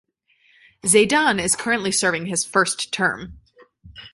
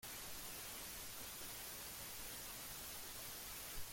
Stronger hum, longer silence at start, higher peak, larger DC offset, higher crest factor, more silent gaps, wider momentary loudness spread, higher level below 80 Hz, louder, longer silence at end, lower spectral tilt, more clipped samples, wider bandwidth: neither; first, 0.85 s vs 0 s; first, -2 dBFS vs -34 dBFS; neither; about the same, 20 dB vs 16 dB; neither; first, 8 LU vs 1 LU; first, -54 dBFS vs -64 dBFS; first, -19 LUFS vs -48 LUFS; about the same, 0.05 s vs 0 s; first, -2.5 dB/octave vs -1 dB/octave; neither; second, 12 kHz vs 17 kHz